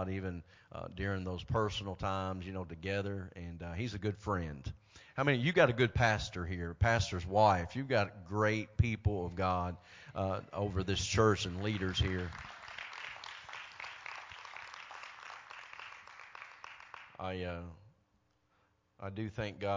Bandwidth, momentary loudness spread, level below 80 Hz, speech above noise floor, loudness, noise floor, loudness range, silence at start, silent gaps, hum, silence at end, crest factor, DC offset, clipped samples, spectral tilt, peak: 7.6 kHz; 19 LU; -50 dBFS; 41 dB; -35 LUFS; -75 dBFS; 16 LU; 0 s; none; none; 0 s; 22 dB; under 0.1%; under 0.1%; -5.5 dB/octave; -14 dBFS